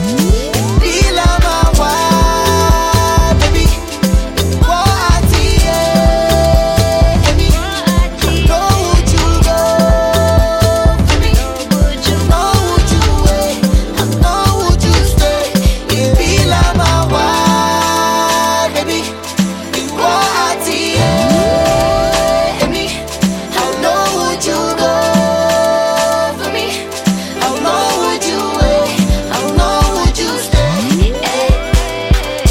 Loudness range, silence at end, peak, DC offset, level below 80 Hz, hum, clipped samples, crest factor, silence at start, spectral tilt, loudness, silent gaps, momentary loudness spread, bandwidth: 2 LU; 0 s; 0 dBFS; under 0.1%; -16 dBFS; none; under 0.1%; 12 dB; 0 s; -4.5 dB/octave; -12 LUFS; none; 5 LU; 17 kHz